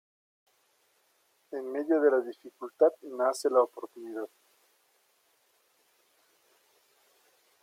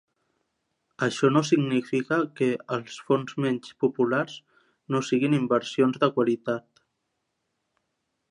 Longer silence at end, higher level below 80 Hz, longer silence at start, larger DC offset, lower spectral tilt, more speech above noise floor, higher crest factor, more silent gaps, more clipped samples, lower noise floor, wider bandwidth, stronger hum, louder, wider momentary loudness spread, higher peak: first, 3.35 s vs 1.7 s; second, under -90 dBFS vs -76 dBFS; first, 1.5 s vs 1 s; neither; second, -3 dB/octave vs -6 dB/octave; second, 42 dB vs 54 dB; about the same, 22 dB vs 18 dB; neither; neither; second, -71 dBFS vs -79 dBFS; first, 15.5 kHz vs 10.5 kHz; neither; second, -29 LUFS vs -26 LUFS; first, 18 LU vs 9 LU; about the same, -10 dBFS vs -8 dBFS